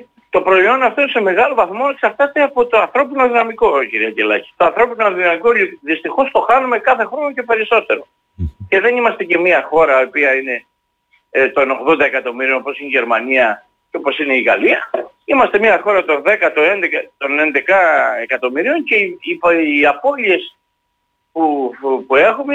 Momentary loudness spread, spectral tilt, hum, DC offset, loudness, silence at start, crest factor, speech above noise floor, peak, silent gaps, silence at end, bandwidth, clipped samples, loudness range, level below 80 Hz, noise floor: 7 LU; -6 dB/octave; none; under 0.1%; -14 LUFS; 0.35 s; 12 dB; 54 dB; -2 dBFS; none; 0 s; 8 kHz; under 0.1%; 2 LU; -46 dBFS; -68 dBFS